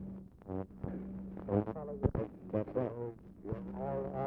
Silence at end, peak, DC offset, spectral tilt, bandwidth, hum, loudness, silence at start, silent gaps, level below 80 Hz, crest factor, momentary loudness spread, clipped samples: 0 s; -18 dBFS; under 0.1%; -11.5 dB/octave; 4 kHz; none; -39 LUFS; 0 s; none; -52 dBFS; 22 dB; 10 LU; under 0.1%